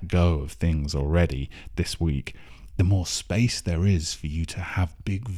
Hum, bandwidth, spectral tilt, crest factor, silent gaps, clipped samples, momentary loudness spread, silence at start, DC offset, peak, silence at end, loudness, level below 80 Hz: none; 13.5 kHz; -5.5 dB/octave; 16 dB; none; under 0.1%; 8 LU; 0 s; under 0.1%; -8 dBFS; 0 s; -26 LUFS; -34 dBFS